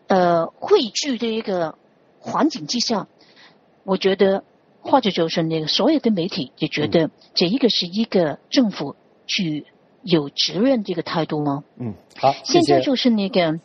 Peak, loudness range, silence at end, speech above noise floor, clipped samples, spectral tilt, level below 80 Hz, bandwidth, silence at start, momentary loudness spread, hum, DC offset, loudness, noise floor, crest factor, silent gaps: -2 dBFS; 3 LU; 0.05 s; 32 dB; under 0.1%; -4 dB/octave; -62 dBFS; 7.2 kHz; 0.1 s; 11 LU; none; under 0.1%; -20 LUFS; -51 dBFS; 18 dB; none